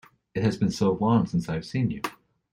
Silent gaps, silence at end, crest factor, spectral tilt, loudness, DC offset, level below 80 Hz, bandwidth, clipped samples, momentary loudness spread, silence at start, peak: none; 0.4 s; 16 dB; -7 dB/octave; -26 LUFS; under 0.1%; -54 dBFS; 16 kHz; under 0.1%; 11 LU; 0.35 s; -10 dBFS